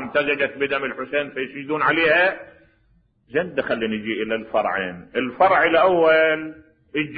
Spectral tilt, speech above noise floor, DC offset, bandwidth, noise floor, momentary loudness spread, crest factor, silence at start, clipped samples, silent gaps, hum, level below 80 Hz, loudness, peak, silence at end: -9 dB/octave; 40 dB; under 0.1%; 5 kHz; -61 dBFS; 11 LU; 16 dB; 0 s; under 0.1%; none; none; -58 dBFS; -20 LUFS; -4 dBFS; 0 s